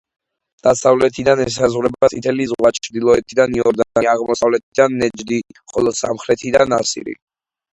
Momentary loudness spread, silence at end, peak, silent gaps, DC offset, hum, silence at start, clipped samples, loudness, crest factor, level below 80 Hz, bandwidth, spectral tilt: 8 LU; 0.6 s; 0 dBFS; 4.63-4.72 s; under 0.1%; none; 0.65 s; under 0.1%; -16 LUFS; 16 dB; -48 dBFS; 11 kHz; -4.5 dB/octave